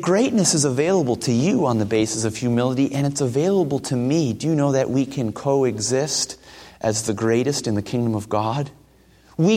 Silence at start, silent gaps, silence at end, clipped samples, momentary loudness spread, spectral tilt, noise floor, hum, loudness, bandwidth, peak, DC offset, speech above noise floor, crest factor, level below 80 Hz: 0 s; none; 0 s; under 0.1%; 6 LU; -5 dB/octave; -53 dBFS; none; -21 LUFS; 16 kHz; -4 dBFS; under 0.1%; 32 dB; 16 dB; -56 dBFS